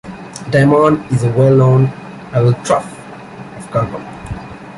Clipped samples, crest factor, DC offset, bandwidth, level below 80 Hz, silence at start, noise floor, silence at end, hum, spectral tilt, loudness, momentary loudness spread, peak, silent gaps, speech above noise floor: under 0.1%; 12 dB; under 0.1%; 11.5 kHz; -42 dBFS; 0.05 s; -32 dBFS; 0 s; none; -7.5 dB/octave; -13 LUFS; 21 LU; -2 dBFS; none; 20 dB